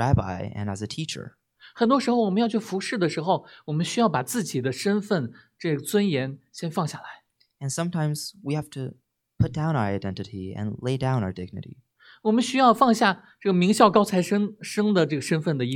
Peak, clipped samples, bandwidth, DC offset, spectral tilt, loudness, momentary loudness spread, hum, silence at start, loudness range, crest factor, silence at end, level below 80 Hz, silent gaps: -2 dBFS; under 0.1%; 17 kHz; under 0.1%; -5.5 dB/octave; -25 LUFS; 15 LU; none; 0 s; 8 LU; 22 dB; 0 s; -50 dBFS; none